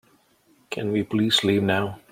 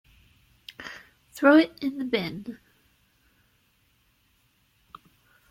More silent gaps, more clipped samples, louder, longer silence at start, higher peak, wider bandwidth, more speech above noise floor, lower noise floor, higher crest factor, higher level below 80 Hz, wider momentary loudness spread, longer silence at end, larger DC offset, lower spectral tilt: neither; neither; about the same, -22 LUFS vs -23 LUFS; about the same, 0.7 s vs 0.8 s; about the same, -8 dBFS vs -6 dBFS; about the same, 16 kHz vs 16 kHz; second, 38 dB vs 44 dB; second, -61 dBFS vs -67 dBFS; about the same, 18 dB vs 22 dB; about the same, -64 dBFS vs -66 dBFS; second, 10 LU vs 28 LU; second, 0.15 s vs 2.95 s; neither; about the same, -5 dB/octave vs -5.5 dB/octave